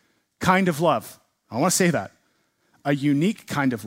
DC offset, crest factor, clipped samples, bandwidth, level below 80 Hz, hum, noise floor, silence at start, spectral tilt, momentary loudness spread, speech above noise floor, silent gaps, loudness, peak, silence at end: under 0.1%; 20 dB; under 0.1%; 16 kHz; -60 dBFS; none; -67 dBFS; 0.4 s; -5 dB/octave; 13 LU; 46 dB; none; -22 LUFS; -4 dBFS; 0 s